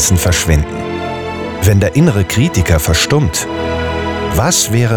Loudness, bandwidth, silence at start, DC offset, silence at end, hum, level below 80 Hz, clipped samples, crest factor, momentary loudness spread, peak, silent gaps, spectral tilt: -13 LUFS; over 20 kHz; 0 s; under 0.1%; 0 s; none; -26 dBFS; under 0.1%; 12 dB; 9 LU; 0 dBFS; none; -4.5 dB/octave